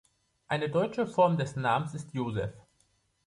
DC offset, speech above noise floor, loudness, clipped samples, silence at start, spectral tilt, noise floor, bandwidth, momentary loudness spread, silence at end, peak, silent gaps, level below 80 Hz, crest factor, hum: under 0.1%; 42 dB; -30 LUFS; under 0.1%; 0.5 s; -6.5 dB/octave; -71 dBFS; 11.5 kHz; 10 LU; 0.65 s; -12 dBFS; none; -60 dBFS; 18 dB; none